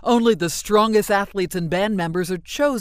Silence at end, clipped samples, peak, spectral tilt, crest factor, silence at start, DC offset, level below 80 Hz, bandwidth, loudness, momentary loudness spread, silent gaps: 0 s; under 0.1%; -4 dBFS; -5 dB/octave; 16 dB; 0 s; under 0.1%; -46 dBFS; 16 kHz; -20 LUFS; 7 LU; none